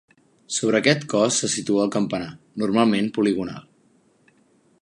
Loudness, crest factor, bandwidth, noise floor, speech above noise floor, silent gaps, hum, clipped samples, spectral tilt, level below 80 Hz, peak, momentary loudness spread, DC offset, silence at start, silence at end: -21 LUFS; 20 dB; 11.5 kHz; -60 dBFS; 39 dB; none; none; under 0.1%; -4 dB/octave; -62 dBFS; -2 dBFS; 10 LU; under 0.1%; 0.5 s; 1.2 s